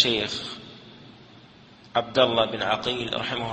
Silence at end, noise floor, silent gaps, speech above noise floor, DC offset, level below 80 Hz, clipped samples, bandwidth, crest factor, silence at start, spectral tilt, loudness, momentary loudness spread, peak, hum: 0 s; -51 dBFS; none; 25 dB; under 0.1%; -58 dBFS; under 0.1%; 8.8 kHz; 22 dB; 0 s; -4 dB/octave; -25 LUFS; 18 LU; -4 dBFS; none